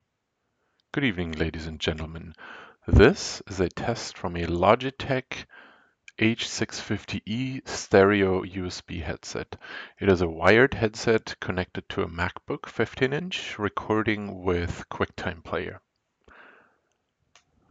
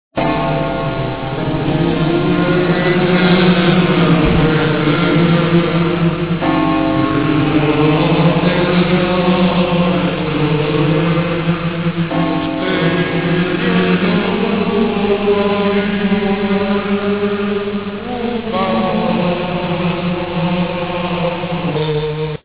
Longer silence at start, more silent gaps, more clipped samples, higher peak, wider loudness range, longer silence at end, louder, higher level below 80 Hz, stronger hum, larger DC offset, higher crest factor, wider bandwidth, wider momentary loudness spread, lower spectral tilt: first, 0.95 s vs 0.1 s; neither; neither; about the same, -4 dBFS vs -2 dBFS; about the same, 5 LU vs 5 LU; first, 1.9 s vs 0.05 s; second, -26 LUFS vs -15 LUFS; second, -42 dBFS vs -36 dBFS; neither; second, under 0.1% vs 1%; first, 22 dB vs 12 dB; first, 8.8 kHz vs 4 kHz; first, 16 LU vs 7 LU; second, -5.5 dB/octave vs -11 dB/octave